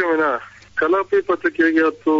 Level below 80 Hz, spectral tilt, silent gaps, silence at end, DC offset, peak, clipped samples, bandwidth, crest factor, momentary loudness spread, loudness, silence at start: -58 dBFS; -6 dB/octave; none; 0 s; under 0.1%; -6 dBFS; under 0.1%; 7.4 kHz; 12 dB; 8 LU; -19 LUFS; 0 s